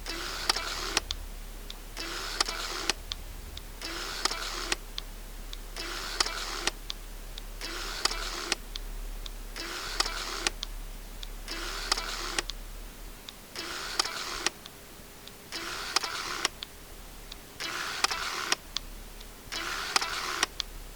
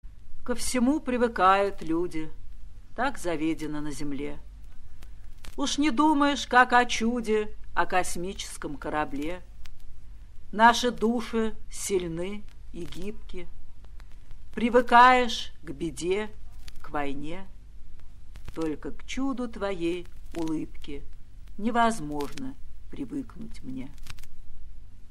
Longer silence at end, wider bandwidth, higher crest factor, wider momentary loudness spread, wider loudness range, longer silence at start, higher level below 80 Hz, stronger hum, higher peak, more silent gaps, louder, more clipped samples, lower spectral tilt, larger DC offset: about the same, 0 s vs 0 s; first, over 20 kHz vs 13 kHz; first, 30 dB vs 22 dB; second, 16 LU vs 22 LU; second, 3 LU vs 10 LU; about the same, 0 s vs 0.05 s; about the same, -44 dBFS vs -42 dBFS; neither; about the same, -4 dBFS vs -4 dBFS; neither; second, -32 LUFS vs -26 LUFS; neither; second, -1 dB/octave vs -4 dB/octave; first, 0.1% vs under 0.1%